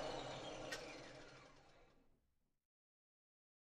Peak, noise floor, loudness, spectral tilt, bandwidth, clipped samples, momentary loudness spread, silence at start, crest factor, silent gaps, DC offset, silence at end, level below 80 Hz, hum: -34 dBFS; -84 dBFS; -51 LUFS; -3.5 dB/octave; 13 kHz; under 0.1%; 16 LU; 0 s; 20 dB; none; under 0.1%; 1.45 s; -70 dBFS; none